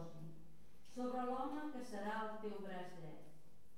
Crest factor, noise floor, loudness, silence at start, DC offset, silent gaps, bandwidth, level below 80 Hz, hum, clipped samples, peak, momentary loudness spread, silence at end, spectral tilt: 16 dB; -67 dBFS; -47 LUFS; 0 s; 0.4%; none; 16 kHz; -74 dBFS; none; under 0.1%; -30 dBFS; 20 LU; 0 s; -6 dB/octave